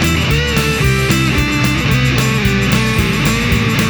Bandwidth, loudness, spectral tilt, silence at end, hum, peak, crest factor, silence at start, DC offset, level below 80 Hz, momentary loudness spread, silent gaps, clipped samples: over 20 kHz; -13 LUFS; -5 dB/octave; 0 s; none; 0 dBFS; 14 dB; 0 s; under 0.1%; -24 dBFS; 1 LU; none; under 0.1%